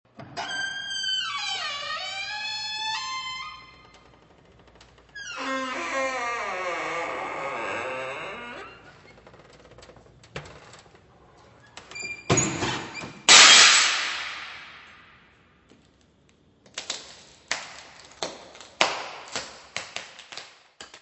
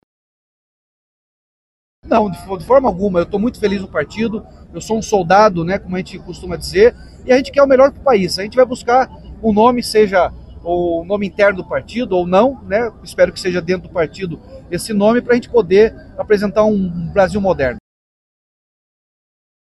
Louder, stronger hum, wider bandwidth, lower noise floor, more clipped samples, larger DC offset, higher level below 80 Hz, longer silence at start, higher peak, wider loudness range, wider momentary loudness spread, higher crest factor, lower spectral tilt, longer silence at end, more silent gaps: second, -22 LUFS vs -15 LUFS; neither; second, 11 kHz vs 12.5 kHz; second, -60 dBFS vs under -90 dBFS; neither; neither; second, -62 dBFS vs -40 dBFS; second, 0.2 s vs 2.05 s; about the same, 0 dBFS vs 0 dBFS; first, 21 LU vs 4 LU; first, 21 LU vs 13 LU; first, 28 dB vs 16 dB; second, -0.5 dB/octave vs -6 dB/octave; second, 0.05 s vs 2 s; neither